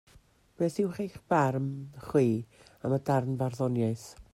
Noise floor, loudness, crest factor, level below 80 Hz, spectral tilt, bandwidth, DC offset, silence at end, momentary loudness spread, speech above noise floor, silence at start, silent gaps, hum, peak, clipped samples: -61 dBFS; -30 LUFS; 18 dB; -62 dBFS; -8 dB/octave; 14.5 kHz; under 0.1%; 0.1 s; 12 LU; 31 dB; 0.6 s; none; none; -12 dBFS; under 0.1%